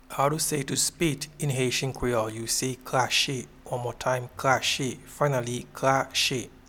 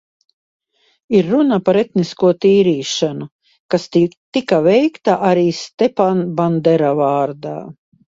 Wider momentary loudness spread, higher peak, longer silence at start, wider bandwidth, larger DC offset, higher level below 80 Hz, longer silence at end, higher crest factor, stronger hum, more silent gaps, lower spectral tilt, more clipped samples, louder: about the same, 7 LU vs 9 LU; second, -6 dBFS vs 0 dBFS; second, 0.1 s vs 1.1 s; first, 18.5 kHz vs 7.8 kHz; neither; first, -52 dBFS vs -58 dBFS; second, 0.2 s vs 0.45 s; first, 22 dB vs 16 dB; neither; second, none vs 3.32-3.39 s, 3.60-3.69 s, 4.17-4.32 s, 5.74-5.78 s; second, -3.5 dB/octave vs -6.5 dB/octave; neither; second, -27 LUFS vs -15 LUFS